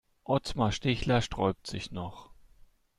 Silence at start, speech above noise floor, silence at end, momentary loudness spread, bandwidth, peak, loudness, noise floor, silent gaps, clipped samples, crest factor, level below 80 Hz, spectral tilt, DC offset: 0.3 s; 29 dB; 0.65 s; 11 LU; 12.5 kHz; -12 dBFS; -31 LUFS; -59 dBFS; none; under 0.1%; 20 dB; -48 dBFS; -5.5 dB/octave; under 0.1%